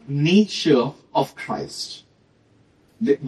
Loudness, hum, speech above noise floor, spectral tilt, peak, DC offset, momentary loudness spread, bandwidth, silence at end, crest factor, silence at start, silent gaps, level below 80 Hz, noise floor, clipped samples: -21 LUFS; none; 38 dB; -6 dB/octave; -4 dBFS; under 0.1%; 14 LU; 13 kHz; 0 s; 18 dB; 0.05 s; none; -64 dBFS; -58 dBFS; under 0.1%